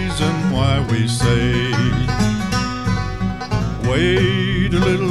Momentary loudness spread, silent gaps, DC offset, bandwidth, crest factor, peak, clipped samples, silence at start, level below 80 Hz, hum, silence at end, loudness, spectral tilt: 5 LU; none; 0.8%; 12.5 kHz; 14 dB; -4 dBFS; under 0.1%; 0 s; -30 dBFS; none; 0 s; -18 LUFS; -6 dB/octave